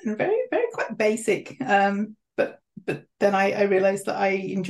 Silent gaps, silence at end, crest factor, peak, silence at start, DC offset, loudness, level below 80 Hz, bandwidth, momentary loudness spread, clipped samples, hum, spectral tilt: none; 0 s; 16 dB; -8 dBFS; 0.05 s; under 0.1%; -24 LUFS; -72 dBFS; 12.5 kHz; 10 LU; under 0.1%; none; -5.5 dB/octave